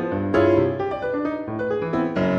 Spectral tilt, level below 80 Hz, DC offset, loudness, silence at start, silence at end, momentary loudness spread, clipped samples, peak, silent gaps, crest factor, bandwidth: -8.5 dB/octave; -50 dBFS; under 0.1%; -22 LUFS; 0 s; 0 s; 8 LU; under 0.1%; -6 dBFS; none; 16 dB; 6.8 kHz